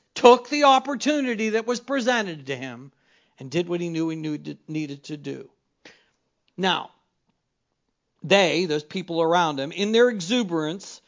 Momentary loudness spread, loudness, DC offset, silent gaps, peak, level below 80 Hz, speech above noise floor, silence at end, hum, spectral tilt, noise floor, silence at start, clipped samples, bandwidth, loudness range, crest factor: 17 LU; -23 LUFS; under 0.1%; none; 0 dBFS; -76 dBFS; 54 dB; 0.1 s; none; -4.5 dB/octave; -77 dBFS; 0.15 s; under 0.1%; 7.6 kHz; 9 LU; 24 dB